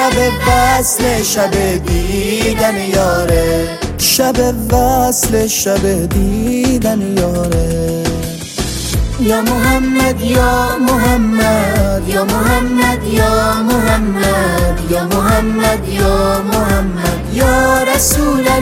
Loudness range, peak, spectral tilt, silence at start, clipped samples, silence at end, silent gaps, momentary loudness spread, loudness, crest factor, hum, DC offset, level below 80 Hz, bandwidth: 2 LU; 0 dBFS; -4.5 dB/octave; 0 s; under 0.1%; 0 s; none; 5 LU; -13 LUFS; 12 dB; none; under 0.1%; -22 dBFS; 17 kHz